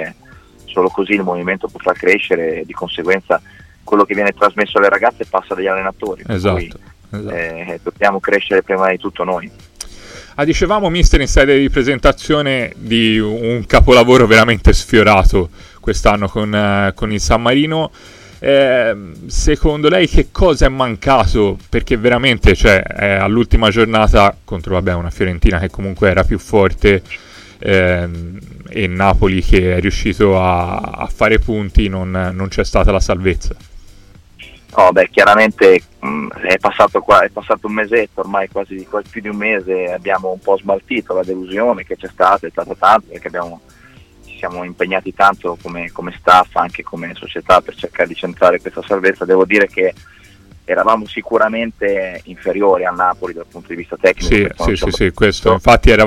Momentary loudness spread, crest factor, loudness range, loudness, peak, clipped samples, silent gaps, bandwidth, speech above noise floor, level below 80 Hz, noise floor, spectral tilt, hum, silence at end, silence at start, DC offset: 14 LU; 14 dB; 6 LU; -14 LUFS; 0 dBFS; under 0.1%; none; 14.5 kHz; 29 dB; -22 dBFS; -42 dBFS; -5.5 dB/octave; none; 0 s; 0 s; under 0.1%